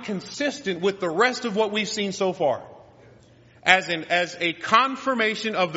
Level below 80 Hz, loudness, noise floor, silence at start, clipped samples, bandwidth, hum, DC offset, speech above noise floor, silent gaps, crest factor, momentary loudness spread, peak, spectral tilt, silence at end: -66 dBFS; -23 LUFS; -53 dBFS; 0 s; under 0.1%; 8 kHz; none; under 0.1%; 29 dB; none; 24 dB; 7 LU; 0 dBFS; -1.5 dB/octave; 0 s